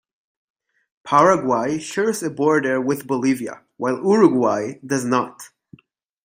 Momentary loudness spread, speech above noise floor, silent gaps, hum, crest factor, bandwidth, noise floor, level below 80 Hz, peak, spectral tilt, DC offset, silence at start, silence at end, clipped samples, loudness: 10 LU; 37 dB; none; none; 20 dB; 16 kHz; -56 dBFS; -66 dBFS; 0 dBFS; -5.5 dB/octave; under 0.1%; 1.05 s; 0.8 s; under 0.1%; -19 LUFS